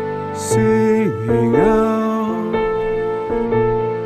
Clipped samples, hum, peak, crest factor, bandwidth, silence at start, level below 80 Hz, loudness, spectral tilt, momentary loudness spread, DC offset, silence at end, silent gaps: under 0.1%; none; -2 dBFS; 14 dB; 14 kHz; 0 s; -38 dBFS; -17 LUFS; -6.5 dB/octave; 6 LU; 0.2%; 0 s; none